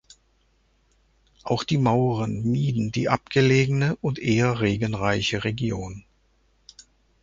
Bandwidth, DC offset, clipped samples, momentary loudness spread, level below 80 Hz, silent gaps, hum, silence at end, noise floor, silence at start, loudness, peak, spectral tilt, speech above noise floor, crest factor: 7.6 kHz; under 0.1%; under 0.1%; 9 LU; -50 dBFS; none; none; 1.25 s; -64 dBFS; 1.45 s; -23 LUFS; -4 dBFS; -6.5 dB/octave; 42 dB; 20 dB